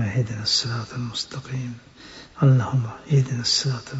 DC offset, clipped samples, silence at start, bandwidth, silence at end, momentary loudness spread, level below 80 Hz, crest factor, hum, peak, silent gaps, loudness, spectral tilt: under 0.1%; under 0.1%; 0 s; 8 kHz; 0 s; 19 LU; -56 dBFS; 16 dB; none; -8 dBFS; none; -23 LUFS; -5 dB/octave